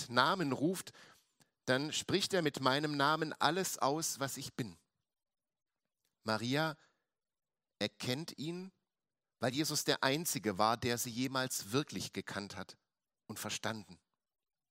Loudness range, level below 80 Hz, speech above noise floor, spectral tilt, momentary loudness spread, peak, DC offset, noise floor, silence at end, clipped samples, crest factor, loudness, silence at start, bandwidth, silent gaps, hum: 7 LU; -76 dBFS; over 54 dB; -3.5 dB/octave; 13 LU; -12 dBFS; under 0.1%; under -90 dBFS; 0.75 s; under 0.1%; 26 dB; -36 LUFS; 0 s; 16 kHz; none; none